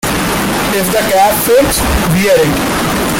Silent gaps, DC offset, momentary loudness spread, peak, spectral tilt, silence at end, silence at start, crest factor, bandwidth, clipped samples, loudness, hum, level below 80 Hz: none; under 0.1%; 4 LU; 0 dBFS; -4 dB/octave; 0 s; 0.05 s; 10 dB; 17 kHz; under 0.1%; -11 LUFS; none; -26 dBFS